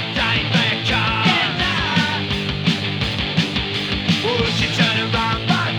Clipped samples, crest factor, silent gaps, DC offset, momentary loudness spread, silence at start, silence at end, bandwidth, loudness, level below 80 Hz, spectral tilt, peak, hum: under 0.1%; 16 dB; none; under 0.1%; 4 LU; 0 s; 0 s; 13 kHz; -18 LUFS; -36 dBFS; -4.5 dB/octave; -2 dBFS; none